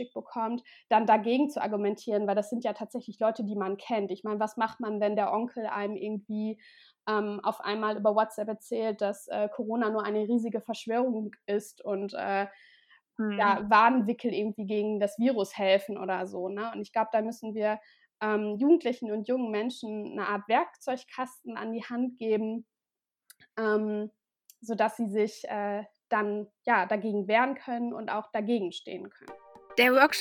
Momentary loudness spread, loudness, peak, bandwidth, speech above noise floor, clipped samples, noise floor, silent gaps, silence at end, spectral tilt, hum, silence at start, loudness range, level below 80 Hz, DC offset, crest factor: 12 LU; -30 LUFS; -8 dBFS; 17.5 kHz; over 61 dB; under 0.1%; under -90 dBFS; none; 0 s; -5.5 dB/octave; none; 0 s; 5 LU; -78 dBFS; under 0.1%; 22 dB